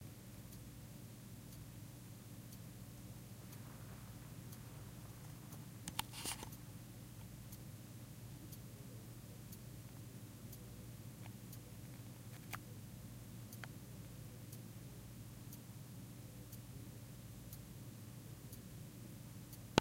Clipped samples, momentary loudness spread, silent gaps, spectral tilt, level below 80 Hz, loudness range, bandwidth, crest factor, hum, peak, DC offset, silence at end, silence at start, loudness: under 0.1%; 4 LU; none; -4.5 dB/octave; -66 dBFS; 4 LU; 16 kHz; 42 dB; none; -8 dBFS; under 0.1%; 0 s; 0 s; -52 LUFS